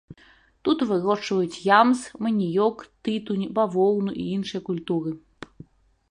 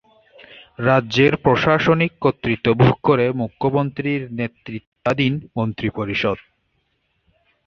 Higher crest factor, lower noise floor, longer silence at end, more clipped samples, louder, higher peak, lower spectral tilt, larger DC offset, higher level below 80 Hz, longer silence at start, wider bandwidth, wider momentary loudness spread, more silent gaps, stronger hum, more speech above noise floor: about the same, 20 dB vs 18 dB; second, -56 dBFS vs -68 dBFS; second, 0.95 s vs 1.3 s; neither; second, -24 LUFS vs -19 LUFS; about the same, -4 dBFS vs -2 dBFS; second, -6 dB/octave vs -7.5 dB/octave; neither; second, -62 dBFS vs -48 dBFS; second, 0.1 s vs 0.5 s; first, 11 kHz vs 6.8 kHz; about the same, 12 LU vs 10 LU; second, none vs 4.87-4.92 s; neither; second, 33 dB vs 49 dB